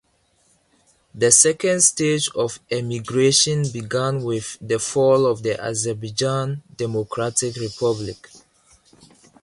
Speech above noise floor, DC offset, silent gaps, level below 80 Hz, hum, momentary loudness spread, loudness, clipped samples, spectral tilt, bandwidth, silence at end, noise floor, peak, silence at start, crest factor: 42 dB; under 0.1%; none; -56 dBFS; none; 12 LU; -20 LUFS; under 0.1%; -3.5 dB/octave; 11.5 kHz; 1.05 s; -62 dBFS; 0 dBFS; 1.15 s; 22 dB